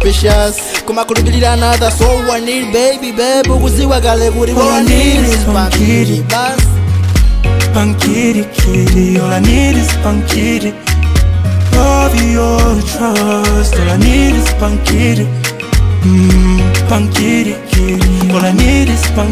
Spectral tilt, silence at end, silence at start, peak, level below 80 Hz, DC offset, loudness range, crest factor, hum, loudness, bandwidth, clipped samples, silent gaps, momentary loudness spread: -5.5 dB/octave; 0 s; 0 s; 0 dBFS; -14 dBFS; under 0.1%; 1 LU; 10 dB; none; -11 LUFS; 16 kHz; under 0.1%; none; 4 LU